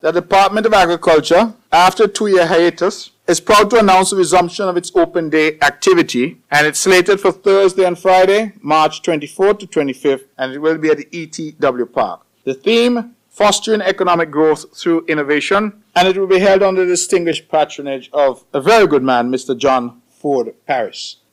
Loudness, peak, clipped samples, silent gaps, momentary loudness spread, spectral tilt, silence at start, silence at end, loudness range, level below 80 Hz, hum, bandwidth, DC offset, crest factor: -14 LUFS; -4 dBFS; under 0.1%; none; 9 LU; -3.5 dB/octave; 0.05 s; 0.2 s; 5 LU; -48 dBFS; none; 16 kHz; under 0.1%; 10 dB